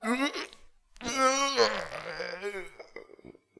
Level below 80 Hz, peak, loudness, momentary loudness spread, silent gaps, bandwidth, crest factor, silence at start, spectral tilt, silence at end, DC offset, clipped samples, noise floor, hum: -60 dBFS; -10 dBFS; -29 LUFS; 21 LU; none; 11 kHz; 22 dB; 0 s; -1.5 dB/octave; 0.3 s; under 0.1%; under 0.1%; -55 dBFS; none